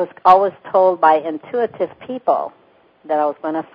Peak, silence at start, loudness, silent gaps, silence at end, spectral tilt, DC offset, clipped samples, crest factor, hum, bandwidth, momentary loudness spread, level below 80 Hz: 0 dBFS; 0 s; -17 LUFS; none; 0.15 s; -7 dB/octave; under 0.1%; under 0.1%; 18 dB; none; 5.4 kHz; 12 LU; -66 dBFS